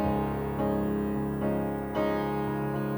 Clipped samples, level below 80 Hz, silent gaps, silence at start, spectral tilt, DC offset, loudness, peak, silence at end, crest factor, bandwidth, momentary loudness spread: under 0.1%; -46 dBFS; none; 0 s; -8.5 dB/octave; under 0.1%; -30 LUFS; -16 dBFS; 0 s; 12 dB; over 20 kHz; 2 LU